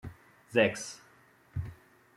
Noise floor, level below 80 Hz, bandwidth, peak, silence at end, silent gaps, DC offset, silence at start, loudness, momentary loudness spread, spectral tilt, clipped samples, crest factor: -62 dBFS; -60 dBFS; 15 kHz; -12 dBFS; 0.45 s; none; under 0.1%; 0.05 s; -32 LUFS; 21 LU; -4.5 dB/octave; under 0.1%; 24 dB